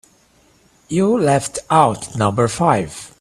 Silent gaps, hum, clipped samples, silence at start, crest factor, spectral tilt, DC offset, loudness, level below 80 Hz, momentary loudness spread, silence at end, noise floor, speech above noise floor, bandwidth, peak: none; none; under 0.1%; 0.9 s; 18 dB; -5.5 dB/octave; under 0.1%; -17 LUFS; -50 dBFS; 5 LU; 0.15 s; -54 dBFS; 38 dB; 15 kHz; 0 dBFS